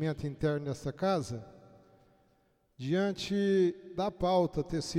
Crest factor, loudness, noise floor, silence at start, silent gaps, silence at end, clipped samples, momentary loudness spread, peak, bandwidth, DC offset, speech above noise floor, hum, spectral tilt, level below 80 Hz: 16 dB; -32 LUFS; -71 dBFS; 0 s; none; 0 s; under 0.1%; 9 LU; -18 dBFS; 14 kHz; under 0.1%; 40 dB; none; -6.5 dB/octave; -56 dBFS